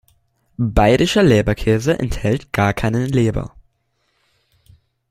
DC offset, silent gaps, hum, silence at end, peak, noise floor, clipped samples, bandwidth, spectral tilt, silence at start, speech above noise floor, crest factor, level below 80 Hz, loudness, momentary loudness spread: under 0.1%; none; none; 1.65 s; -2 dBFS; -67 dBFS; under 0.1%; 15.5 kHz; -6.5 dB/octave; 0.6 s; 51 dB; 18 dB; -32 dBFS; -17 LUFS; 8 LU